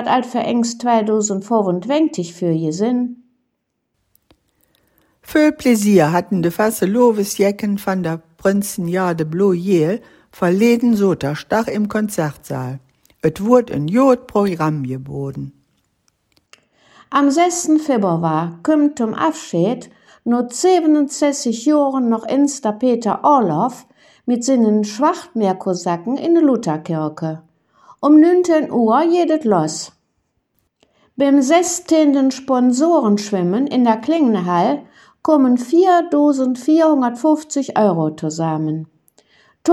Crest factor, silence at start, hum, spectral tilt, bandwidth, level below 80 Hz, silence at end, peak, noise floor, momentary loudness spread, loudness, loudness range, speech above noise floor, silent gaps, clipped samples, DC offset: 16 dB; 0 s; none; -6 dB/octave; 16.5 kHz; -58 dBFS; 0 s; 0 dBFS; -72 dBFS; 9 LU; -16 LUFS; 4 LU; 57 dB; none; under 0.1%; under 0.1%